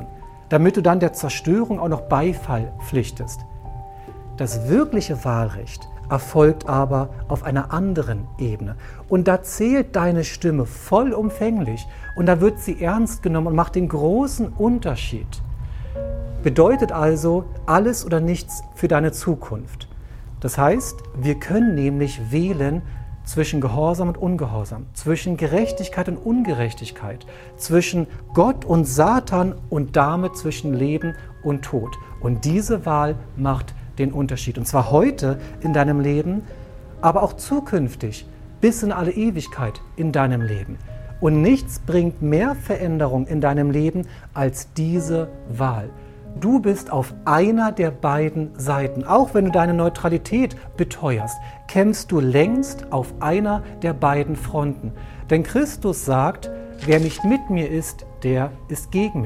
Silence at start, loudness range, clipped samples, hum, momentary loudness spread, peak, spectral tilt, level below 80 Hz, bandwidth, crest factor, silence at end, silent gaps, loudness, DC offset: 0 s; 3 LU; under 0.1%; none; 14 LU; -2 dBFS; -7 dB/octave; -36 dBFS; 16 kHz; 20 dB; 0 s; none; -21 LUFS; under 0.1%